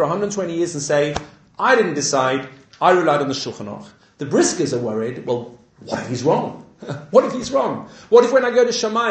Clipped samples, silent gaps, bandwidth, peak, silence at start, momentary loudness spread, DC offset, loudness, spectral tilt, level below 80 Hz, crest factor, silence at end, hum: under 0.1%; none; 9 kHz; 0 dBFS; 0 s; 17 LU; under 0.1%; -19 LUFS; -4 dB/octave; -54 dBFS; 18 dB; 0 s; none